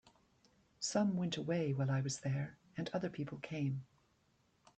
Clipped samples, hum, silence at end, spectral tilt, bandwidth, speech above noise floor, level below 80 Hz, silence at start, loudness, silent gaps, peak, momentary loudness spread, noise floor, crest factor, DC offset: under 0.1%; none; 0.9 s; -5.5 dB/octave; 9 kHz; 37 dB; -74 dBFS; 0.8 s; -39 LUFS; none; -24 dBFS; 9 LU; -75 dBFS; 16 dB; under 0.1%